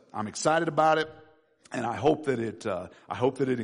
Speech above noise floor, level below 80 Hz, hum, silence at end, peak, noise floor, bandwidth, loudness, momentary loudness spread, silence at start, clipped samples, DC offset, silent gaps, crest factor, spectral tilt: 31 dB; -66 dBFS; none; 0 s; -12 dBFS; -59 dBFS; 10.5 kHz; -28 LUFS; 13 LU; 0.15 s; under 0.1%; under 0.1%; none; 16 dB; -5 dB/octave